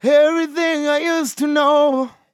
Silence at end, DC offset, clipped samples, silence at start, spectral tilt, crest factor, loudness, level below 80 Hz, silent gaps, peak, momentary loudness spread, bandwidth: 0.25 s; under 0.1%; under 0.1%; 0.05 s; -3 dB/octave; 14 dB; -17 LUFS; -80 dBFS; none; -4 dBFS; 6 LU; 15 kHz